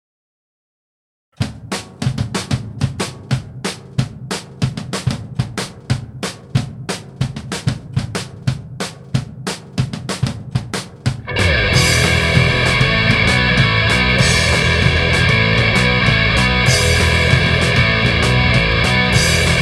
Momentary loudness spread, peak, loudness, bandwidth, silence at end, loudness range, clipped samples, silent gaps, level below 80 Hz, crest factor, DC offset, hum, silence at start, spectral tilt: 13 LU; 0 dBFS; -15 LUFS; 14 kHz; 0 s; 11 LU; under 0.1%; none; -28 dBFS; 16 dB; under 0.1%; none; 1.4 s; -4.5 dB/octave